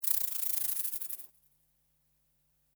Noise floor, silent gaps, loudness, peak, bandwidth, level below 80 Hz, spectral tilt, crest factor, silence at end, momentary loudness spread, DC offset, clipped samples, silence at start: -74 dBFS; none; -31 LUFS; -10 dBFS; over 20 kHz; -82 dBFS; 3 dB/octave; 28 dB; 1.5 s; 13 LU; under 0.1%; under 0.1%; 0 s